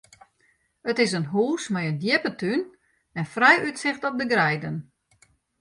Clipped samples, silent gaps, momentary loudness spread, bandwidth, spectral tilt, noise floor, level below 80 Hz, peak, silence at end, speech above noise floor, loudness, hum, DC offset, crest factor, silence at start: under 0.1%; none; 16 LU; 11.5 kHz; -5 dB/octave; -66 dBFS; -66 dBFS; -2 dBFS; 0.8 s; 43 dB; -23 LUFS; none; under 0.1%; 22 dB; 0.85 s